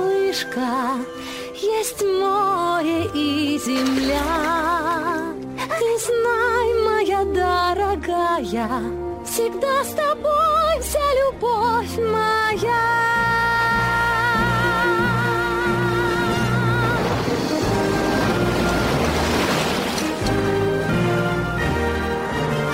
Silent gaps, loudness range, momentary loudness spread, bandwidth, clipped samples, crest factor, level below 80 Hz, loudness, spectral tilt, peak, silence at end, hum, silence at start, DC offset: none; 3 LU; 5 LU; 16 kHz; under 0.1%; 12 dB; -38 dBFS; -20 LUFS; -5 dB/octave; -8 dBFS; 0 s; none; 0 s; under 0.1%